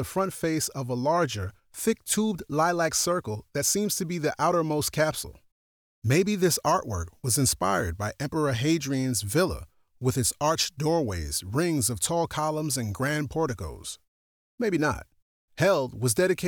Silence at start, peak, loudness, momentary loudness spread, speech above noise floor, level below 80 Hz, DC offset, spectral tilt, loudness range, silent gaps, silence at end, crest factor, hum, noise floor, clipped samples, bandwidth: 0 s; -12 dBFS; -26 LUFS; 8 LU; over 64 dB; -52 dBFS; under 0.1%; -4 dB/octave; 3 LU; 5.52-6.02 s, 14.08-14.58 s, 15.22-15.48 s; 0 s; 16 dB; none; under -90 dBFS; under 0.1%; over 20 kHz